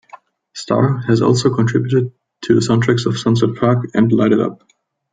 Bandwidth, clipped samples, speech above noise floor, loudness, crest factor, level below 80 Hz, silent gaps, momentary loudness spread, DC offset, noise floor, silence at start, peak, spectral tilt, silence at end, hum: 9.2 kHz; under 0.1%; 29 dB; -15 LUFS; 16 dB; -52 dBFS; none; 9 LU; under 0.1%; -43 dBFS; 0.55 s; 0 dBFS; -7 dB/octave; 0.6 s; none